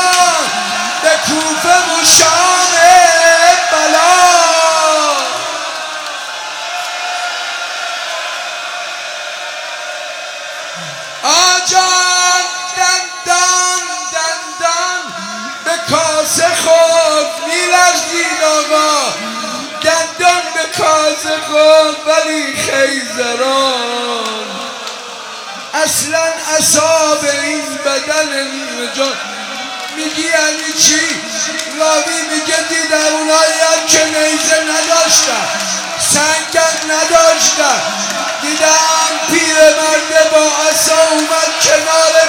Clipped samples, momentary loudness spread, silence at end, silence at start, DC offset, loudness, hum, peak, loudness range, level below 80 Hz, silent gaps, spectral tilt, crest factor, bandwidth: 0.4%; 13 LU; 0 s; 0 s; under 0.1%; -11 LUFS; none; 0 dBFS; 8 LU; -56 dBFS; none; 0 dB/octave; 12 dB; over 20 kHz